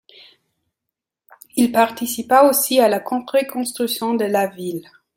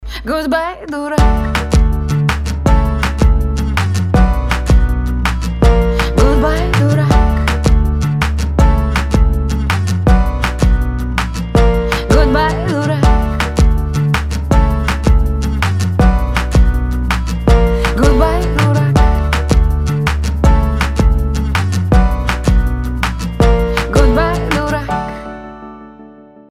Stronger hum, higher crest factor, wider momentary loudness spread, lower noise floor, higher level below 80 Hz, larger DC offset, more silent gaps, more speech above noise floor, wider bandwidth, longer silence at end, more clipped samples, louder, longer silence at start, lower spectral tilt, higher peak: neither; first, 18 dB vs 12 dB; first, 13 LU vs 5 LU; first, -83 dBFS vs -38 dBFS; second, -66 dBFS vs -14 dBFS; second, under 0.1% vs 0.6%; neither; first, 65 dB vs 24 dB; first, 17 kHz vs 14 kHz; about the same, 0.35 s vs 0.4 s; neither; second, -18 LUFS vs -14 LUFS; first, 1.55 s vs 0 s; second, -3.5 dB/octave vs -6.5 dB/octave; about the same, -2 dBFS vs 0 dBFS